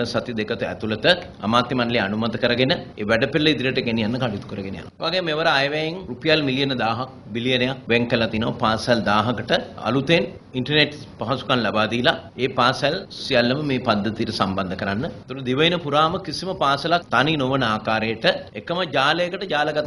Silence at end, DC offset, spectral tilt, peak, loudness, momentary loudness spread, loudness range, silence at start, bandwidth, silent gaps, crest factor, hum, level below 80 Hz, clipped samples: 0 s; under 0.1%; -5.5 dB/octave; -2 dBFS; -21 LUFS; 8 LU; 2 LU; 0 s; 11.5 kHz; none; 20 dB; none; -50 dBFS; under 0.1%